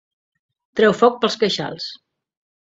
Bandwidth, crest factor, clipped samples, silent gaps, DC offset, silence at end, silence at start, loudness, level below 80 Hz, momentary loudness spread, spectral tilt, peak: 7.8 kHz; 20 dB; under 0.1%; none; under 0.1%; 0.65 s; 0.75 s; -18 LUFS; -64 dBFS; 15 LU; -4.5 dB/octave; 0 dBFS